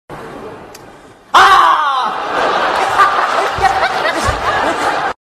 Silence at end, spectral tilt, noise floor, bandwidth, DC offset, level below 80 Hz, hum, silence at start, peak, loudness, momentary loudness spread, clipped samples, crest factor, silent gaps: 0.15 s; -3 dB/octave; -39 dBFS; 14 kHz; under 0.1%; -38 dBFS; none; 0.1 s; 0 dBFS; -12 LUFS; 22 LU; under 0.1%; 14 dB; none